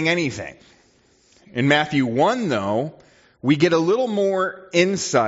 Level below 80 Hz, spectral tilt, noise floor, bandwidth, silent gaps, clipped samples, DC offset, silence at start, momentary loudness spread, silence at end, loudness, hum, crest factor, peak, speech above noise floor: -60 dBFS; -4 dB/octave; -58 dBFS; 8 kHz; none; under 0.1%; under 0.1%; 0 s; 10 LU; 0 s; -20 LUFS; none; 18 dB; -2 dBFS; 38 dB